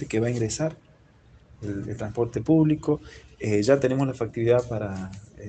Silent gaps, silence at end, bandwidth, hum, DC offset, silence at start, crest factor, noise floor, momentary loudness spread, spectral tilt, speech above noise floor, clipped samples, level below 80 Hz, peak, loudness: none; 0 s; 9 kHz; none; under 0.1%; 0 s; 20 dB; -55 dBFS; 13 LU; -7 dB/octave; 30 dB; under 0.1%; -52 dBFS; -6 dBFS; -25 LUFS